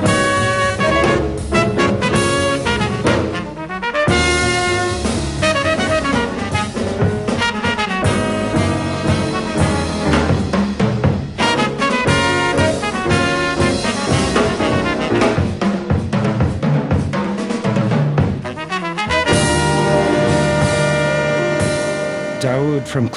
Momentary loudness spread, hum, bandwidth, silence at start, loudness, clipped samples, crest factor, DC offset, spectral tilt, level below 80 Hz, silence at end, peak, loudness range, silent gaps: 5 LU; none; 11.5 kHz; 0 s; -17 LUFS; under 0.1%; 14 dB; under 0.1%; -5 dB/octave; -34 dBFS; 0 s; -2 dBFS; 2 LU; none